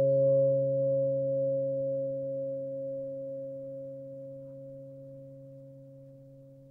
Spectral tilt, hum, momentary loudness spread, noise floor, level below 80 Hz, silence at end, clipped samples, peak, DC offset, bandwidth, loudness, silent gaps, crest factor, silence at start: -13 dB/octave; none; 24 LU; -52 dBFS; -76 dBFS; 0 s; under 0.1%; -18 dBFS; under 0.1%; 1.2 kHz; -31 LUFS; none; 14 dB; 0 s